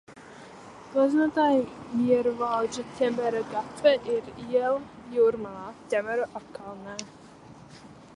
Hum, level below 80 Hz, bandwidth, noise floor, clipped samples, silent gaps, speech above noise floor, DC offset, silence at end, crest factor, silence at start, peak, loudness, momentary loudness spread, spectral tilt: none; -64 dBFS; 11 kHz; -49 dBFS; under 0.1%; none; 22 dB; under 0.1%; 0.2 s; 18 dB; 0.1 s; -10 dBFS; -26 LUFS; 18 LU; -5 dB/octave